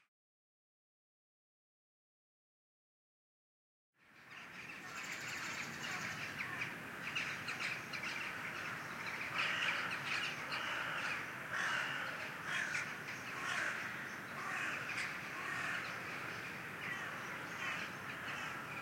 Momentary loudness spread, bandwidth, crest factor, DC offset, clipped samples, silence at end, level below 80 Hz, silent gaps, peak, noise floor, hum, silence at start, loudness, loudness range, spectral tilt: 7 LU; 16.5 kHz; 20 dB; under 0.1%; under 0.1%; 0 s; -80 dBFS; none; -24 dBFS; under -90 dBFS; none; 4.05 s; -41 LUFS; 7 LU; -2.5 dB/octave